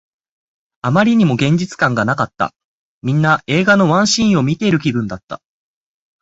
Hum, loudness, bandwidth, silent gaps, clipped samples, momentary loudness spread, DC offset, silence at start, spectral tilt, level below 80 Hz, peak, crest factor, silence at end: none; -15 LUFS; 8 kHz; 2.65-3.02 s, 5.24-5.28 s; under 0.1%; 13 LU; under 0.1%; 0.85 s; -5.5 dB/octave; -50 dBFS; -2 dBFS; 16 dB; 0.85 s